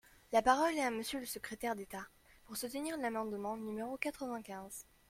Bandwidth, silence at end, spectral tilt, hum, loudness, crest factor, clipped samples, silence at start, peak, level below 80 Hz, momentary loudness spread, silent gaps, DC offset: 16.5 kHz; 0.3 s; -3.5 dB/octave; none; -38 LUFS; 22 dB; under 0.1%; 0.3 s; -16 dBFS; -66 dBFS; 16 LU; none; under 0.1%